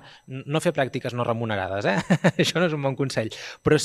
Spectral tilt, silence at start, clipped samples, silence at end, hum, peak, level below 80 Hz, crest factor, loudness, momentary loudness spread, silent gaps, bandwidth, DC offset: -5.5 dB/octave; 0.05 s; under 0.1%; 0 s; none; -4 dBFS; -56 dBFS; 20 dB; -24 LUFS; 7 LU; none; 13.5 kHz; under 0.1%